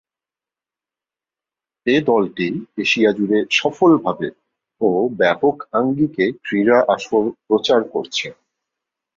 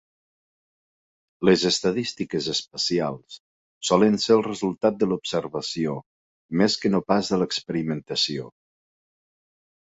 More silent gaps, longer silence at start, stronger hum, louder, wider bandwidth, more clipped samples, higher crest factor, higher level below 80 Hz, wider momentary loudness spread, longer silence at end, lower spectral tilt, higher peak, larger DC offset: second, none vs 3.40-3.81 s, 6.06-6.49 s; first, 1.85 s vs 1.4 s; neither; first, -18 LUFS vs -23 LUFS; about the same, 7.6 kHz vs 8 kHz; neither; second, 16 dB vs 22 dB; about the same, -60 dBFS vs -60 dBFS; about the same, 9 LU vs 10 LU; second, 0.85 s vs 1.5 s; about the same, -5 dB/octave vs -4.5 dB/octave; about the same, -2 dBFS vs -4 dBFS; neither